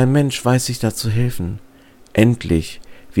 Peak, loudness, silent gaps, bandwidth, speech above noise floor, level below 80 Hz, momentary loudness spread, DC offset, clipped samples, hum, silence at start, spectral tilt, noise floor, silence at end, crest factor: 0 dBFS; -19 LUFS; none; 17 kHz; 22 dB; -38 dBFS; 14 LU; under 0.1%; under 0.1%; none; 0 s; -6 dB/octave; -39 dBFS; 0 s; 18 dB